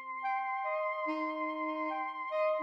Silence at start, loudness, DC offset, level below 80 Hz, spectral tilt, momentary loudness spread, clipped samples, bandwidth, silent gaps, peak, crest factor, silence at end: 0 s; -35 LUFS; under 0.1%; under -90 dBFS; -3.5 dB/octave; 3 LU; under 0.1%; 6 kHz; none; -22 dBFS; 12 dB; 0 s